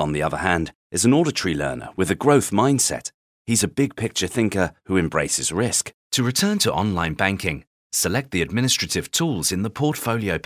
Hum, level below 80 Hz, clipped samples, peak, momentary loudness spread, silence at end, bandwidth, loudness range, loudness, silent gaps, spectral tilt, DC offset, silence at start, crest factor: none; -44 dBFS; under 0.1%; -2 dBFS; 8 LU; 0.05 s; 16 kHz; 2 LU; -21 LUFS; 0.75-0.90 s, 3.14-3.45 s, 5.94-6.11 s, 7.67-7.90 s; -4 dB/octave; under 0.1%; 0 s; 20 dB